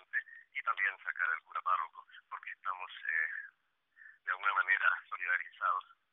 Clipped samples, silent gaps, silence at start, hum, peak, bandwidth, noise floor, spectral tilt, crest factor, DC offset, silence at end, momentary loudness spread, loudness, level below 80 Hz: under 0.1%; none; 0.15 s; none; -16 dBFS; 4 kHz; -72 dBFS; 7.5 dB/octave; 20 dB; under 0.1%; 0.3 s; 15 LU; -35 LUFS; under -90 dBFS